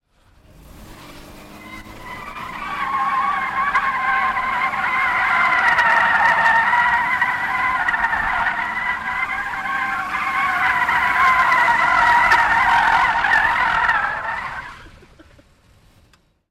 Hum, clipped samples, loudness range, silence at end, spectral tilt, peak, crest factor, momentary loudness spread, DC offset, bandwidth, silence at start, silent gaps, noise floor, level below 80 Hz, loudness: none; under 0.1%; 8 LU; 1.6 s; -2.5 dB/octave; -4 dBFS; 14 dB; 13 LU; under 0.1%; 15.5 kHz; 0.65 s; none; -56 dBFS; -46 dBFS; -17 LUFS